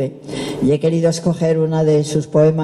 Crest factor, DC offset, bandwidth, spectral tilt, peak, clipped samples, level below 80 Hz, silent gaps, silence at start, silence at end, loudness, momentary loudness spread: 14 dB; under 0.1%; 12 kHz; -7 dB/octave; -2 dBFS; under 0.1%; -50 dBFS; none; 0 s; 0 s; -17 LUFS; 9 LU